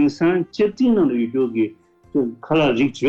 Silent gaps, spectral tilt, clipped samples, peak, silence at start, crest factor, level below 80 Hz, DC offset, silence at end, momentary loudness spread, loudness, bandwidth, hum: none; -7 dB/octave; under 0.1%; -8 dBFS; 0 s; 10 dB; -54 dBFS; under 0.1%; 0 s; 7 LU; -20 LUFS; 8 kHz; none